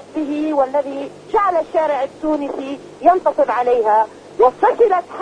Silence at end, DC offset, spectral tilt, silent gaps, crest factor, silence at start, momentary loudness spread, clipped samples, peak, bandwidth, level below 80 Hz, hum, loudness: 0 s; under 0.1%; -5.5 dB/octave; none; 16 dB; 0 s; 10 LU; under 0.1%; 0 dBFS; 10 kHz; -54 dBFS; 50 Hz at -55 dBFS; -17 LUFS